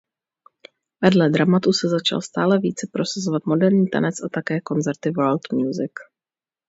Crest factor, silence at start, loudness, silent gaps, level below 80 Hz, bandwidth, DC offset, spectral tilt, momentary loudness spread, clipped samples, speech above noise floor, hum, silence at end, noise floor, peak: 20 dB; 1 s; -20 LUFS; none; -64 dBFS; 8 kHz; under 0.1%; -6 dB/octave; 8 LU; under 0.1%; over 70 dB; none; 0.65 s; under -90 dBFS; 0 dBFS